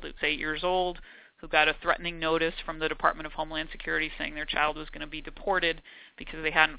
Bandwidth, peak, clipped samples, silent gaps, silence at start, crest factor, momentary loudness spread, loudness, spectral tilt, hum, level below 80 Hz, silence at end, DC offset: 4 kHz; -6 dBFS; under 0.1%; none; 0 s; 24 dB; 14 LU; -29 LUFS; -0.5 dB/octave; none; -48 dBFS; 0 s; under 0.1%